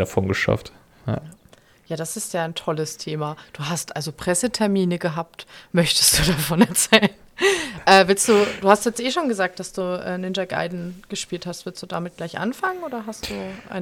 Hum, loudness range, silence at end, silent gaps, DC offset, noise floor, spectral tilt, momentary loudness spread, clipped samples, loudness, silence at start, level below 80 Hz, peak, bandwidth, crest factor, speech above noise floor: none; 11 LU; 0 s; none; under 0.1%; -53 dBFS; -3.5 dB/octave; 16 LU; under 0.1%; -21 LUFS; 0 s; -46 dBFS; 0 dBFS; 18.5 kHz; 22 dB; 31 dB